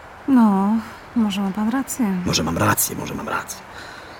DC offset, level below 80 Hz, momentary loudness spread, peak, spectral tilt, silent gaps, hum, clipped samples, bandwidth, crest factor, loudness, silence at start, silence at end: under 0.1%; -48 dBFS; 13 LU; -4 dBFS; -4.5 dB/octave; none; none; under 0.1%; 18.5 kHz; 16 dB; -20 LUFS; 0 s; 0 s